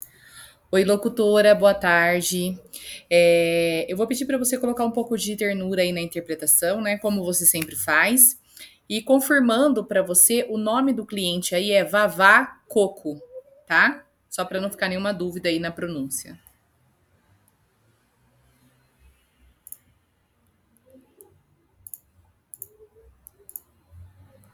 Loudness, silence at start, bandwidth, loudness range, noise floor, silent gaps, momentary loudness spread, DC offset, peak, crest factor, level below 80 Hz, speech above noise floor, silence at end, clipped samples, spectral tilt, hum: -20 LUFS; 0.35 s; over 20 kHz; 10 LU; -66 dBFS; none; 21 LU; under 0.1%; 0 dBFS; 24 dB; -62 dBFS; 45 dB; 0.5 s; under 0.1%; -3 dB/octave; none